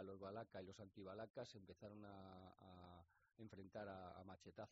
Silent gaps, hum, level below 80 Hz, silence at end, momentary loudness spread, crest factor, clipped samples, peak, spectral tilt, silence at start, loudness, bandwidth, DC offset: 1.30-1.34 s; none; -82 dBFS; 0 s; 9 LU; 18 dB; under 0.1%; -40 dBFS; -5.5 dB/octave; 0 s; -59 LUFS; 7.4 kHz; under 0.1%